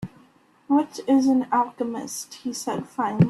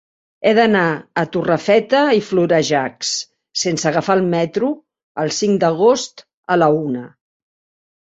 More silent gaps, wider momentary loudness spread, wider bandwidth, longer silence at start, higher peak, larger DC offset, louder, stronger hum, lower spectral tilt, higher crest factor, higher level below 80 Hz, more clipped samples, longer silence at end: second, none vs 5.03-5.15 s, 6.33-6.43 s; about the same, 12 LU vs 10 LU; first, 13 kHz vs 8 kHz; second, 0 s vs 0.4 s; second, -6 dBFS vs -2 dBFS; neither; second, -24 LUFS vs -17 LUFS; neither; first, -6.5 dB/octave vs -4.5 dB/octave; about the same, 18 dB vs 16 dB; about the same, -62 dBFS vs -60 dBFS; neither; second, 0 s vs 0.95 s